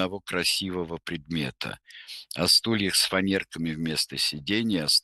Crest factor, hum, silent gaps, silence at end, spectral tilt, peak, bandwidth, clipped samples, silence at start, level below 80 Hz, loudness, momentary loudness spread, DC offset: 18 dB; none; none; 0.05 s; -3 dB/octave; -8 dBFS; 13 kHz; under 0.1%; 0 s; -58 dBFS; -25 LUFS; 15 LU; under 0.1%